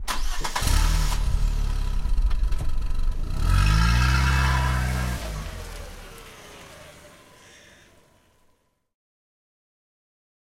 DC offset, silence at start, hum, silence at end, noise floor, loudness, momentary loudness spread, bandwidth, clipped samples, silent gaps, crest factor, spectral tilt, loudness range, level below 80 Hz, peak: under 0.1%; 0 s; none; 3.4 s; -65 dBFS; -25 LUFS; 22 LU; 16 kHz; under 0.1%; none; 16 dB; -4.5 dB/octave; 18 LU; -26 dBFS; -8 dBFS